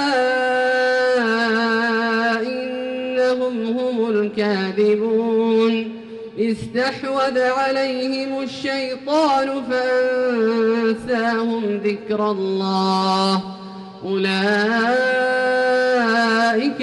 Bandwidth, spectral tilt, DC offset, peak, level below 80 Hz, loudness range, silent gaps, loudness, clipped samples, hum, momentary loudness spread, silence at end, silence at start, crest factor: 11.5 kHz; -5 dB/octave; under 0.1%; -8 dBFS; -62 dBFS; 2 LU; none; -19 LUFS; under 0.1%; none; 7 LU; 0 s; 0 s; 10 dB